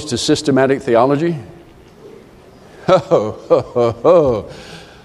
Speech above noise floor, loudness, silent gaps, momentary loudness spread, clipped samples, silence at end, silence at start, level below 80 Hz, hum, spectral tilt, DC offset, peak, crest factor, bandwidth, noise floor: 28 dB; -15 LUFS; none; 14 LU; under 0.1%; 0.2 s; 0 s; -46 dBFS; none; -5.5 dB/octave; under 0.1%; 0 dBFS; 16 dB; 12.5 kHz; -42 dBFS